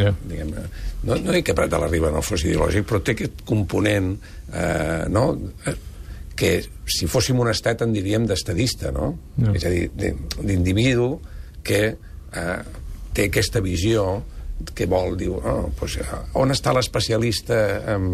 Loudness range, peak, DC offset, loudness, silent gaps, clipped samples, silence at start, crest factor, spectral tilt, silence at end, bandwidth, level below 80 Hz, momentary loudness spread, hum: 2 LU; -6 dBFS; under 0.1%; -22 LUFS; none; under 0.1%; 0 s; 16 dB; -5.5 dB/octave; 0 s; 15 kHz; -34 dBFS; 11 LU; none